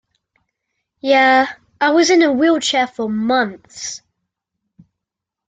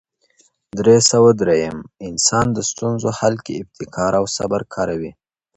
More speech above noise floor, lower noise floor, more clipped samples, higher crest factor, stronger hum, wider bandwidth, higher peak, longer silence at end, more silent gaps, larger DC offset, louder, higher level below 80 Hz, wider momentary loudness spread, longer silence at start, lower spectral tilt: first, 68 dB vs 41 dB; first, -83 dBFS vs -59 dBFS; neither; about the same, 16 dB vs 18 dB; neither; about the same, 9.2 kHz vs 9 kHz; about the same, -2 dBFS vs 0 dBFS; first, 1.5 s vs 0.45 s; neither; neither; about the same, -15 LUFS vs -17 LUFS; second, -64 dBFS vs -48 dBFS; about the same, 16 LU vs 17 LU; first, 1.05 s vs 0.75 s; about the same, -3 dB/octave vs -4 dB/octave